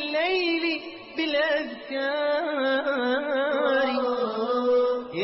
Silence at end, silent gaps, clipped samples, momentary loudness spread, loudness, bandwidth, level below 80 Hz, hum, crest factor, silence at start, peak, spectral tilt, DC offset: 0 s; none; under 0.1%; 6 LU; -25 LUFS; 5.8 kHz; -66 dBFS; none; 12 dB; 0 s; -12 dBFS; -0.5 dB/octave; under 0.1%